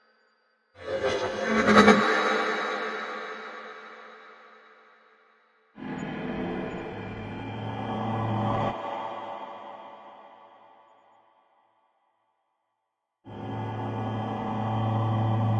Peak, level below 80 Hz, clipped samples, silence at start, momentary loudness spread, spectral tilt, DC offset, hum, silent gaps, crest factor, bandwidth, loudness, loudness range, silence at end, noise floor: -2 dBFS; -58 dBFS; under 0.1%; 0.75 s; 22 LU; -6 dB/octave; under 0.1%; none; none; 28 dB; 11 kHz; -27 LUFS; 17 LU; 0 s; -82 dBFS